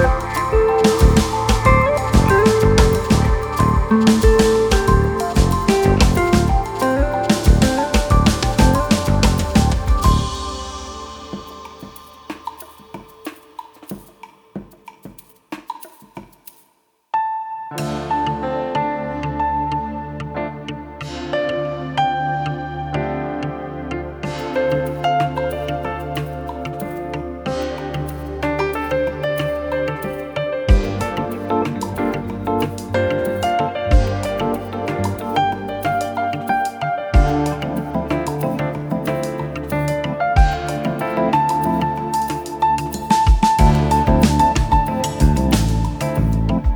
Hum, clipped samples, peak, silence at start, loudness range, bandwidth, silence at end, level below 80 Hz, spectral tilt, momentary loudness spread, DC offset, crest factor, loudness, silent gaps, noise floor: none; under 0.1%; -2 dBFS; 0 s; 14 LU; over 20 kHz; 0 s; -24 dBFS; -6 dB/octave; 17 LU; under 0.1%; 16 dB; -19 LUFS; none; -61 dBFS